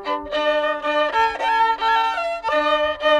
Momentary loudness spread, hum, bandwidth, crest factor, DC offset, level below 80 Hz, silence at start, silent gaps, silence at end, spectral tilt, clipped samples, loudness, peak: 4 LU; none; 11.5 kHz; 12 dB; under 0.1%; -50 dBFS; 0 s; none; 0 s; -2.5 dB/octave; under 0.1%; -20 LUFS; -8 dBFS